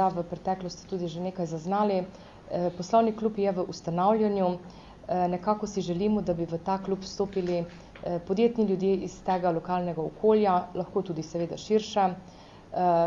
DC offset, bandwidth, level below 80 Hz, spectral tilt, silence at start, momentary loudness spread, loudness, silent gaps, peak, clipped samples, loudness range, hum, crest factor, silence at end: under 0.1%; 7.6 kHz; -56 dBFS; -7 dB/octave; 0 s; 10 LU; -28 LUFS; none; -10 dBFS; under 0.1%; 3 LU; none; 18 dB; 0 s